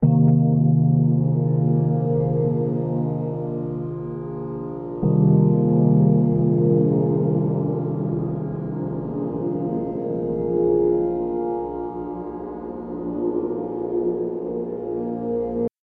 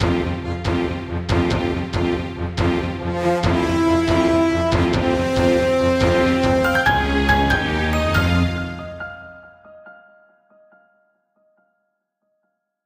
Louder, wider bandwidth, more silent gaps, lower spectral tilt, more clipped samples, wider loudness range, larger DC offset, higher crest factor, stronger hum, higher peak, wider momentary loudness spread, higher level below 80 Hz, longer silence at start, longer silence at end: second, -22 LUFS vs -19 LUFS; second, 2.2 kHz vs 16 kHz; neither; first, -14.5 dB/octave vs -6.5 dB/octave; neither; about the same, 8 LU vs 7 LU; neither; about the same, 14 dB vs 16 dB; neither; about the same, -6 dBFS vs -4 dBFS; first, 13 LU vs 8 LU; second, -50 dBFS vs -32 dBFS; about the same, 0 s vs 0 s; second, 0.15 s vs 2.95 s